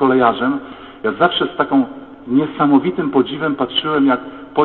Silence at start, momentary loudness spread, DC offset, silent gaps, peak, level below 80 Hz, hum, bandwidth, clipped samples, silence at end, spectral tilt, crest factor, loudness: 0 s; 10 LU; 0.2%; none; 0 dBFS; -54 dBFS; none; 4.3 kHz; under 0.1%; 0 s; -10 dB/octave; 16 dB; -17 LUFS